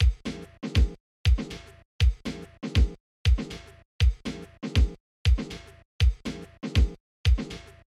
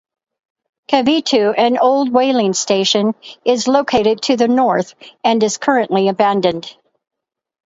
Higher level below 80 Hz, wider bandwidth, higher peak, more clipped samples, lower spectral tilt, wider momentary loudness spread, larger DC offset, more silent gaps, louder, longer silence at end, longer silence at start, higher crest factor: first, -28 dBFS vs -56 dBFS; first, 11 kHz vs 8 kHz; second, -12 dBFS vs 0 dBFS; neither; first, -6 dB/octave vs -4 dB/octave; first, 12 LU vs 7 LU; neither; first, 1.00-1.24 s, 1.85-1.99 s, 3.00-3.25 s, 3.85-3.99 s, 5.00-5.25 s, 5.85-5.99 s, 7.00-7.24 s vs none; second, -28 LUFS vs -15 LUFS; second, 0.4 s vs 0.95 s; second, 0 s vs 0.9 s; about the same, 14 dB vs 16 dB